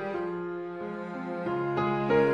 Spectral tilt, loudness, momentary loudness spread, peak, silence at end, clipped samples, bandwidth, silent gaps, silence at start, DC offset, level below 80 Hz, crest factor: -8.5 dB/octave; -31 LUFS; 11 LU; -12 dBFS; 0 s; under 0.1%; 6.8 kHz; none; 0 s; under 0.1%; -66 dBFS; 16 dB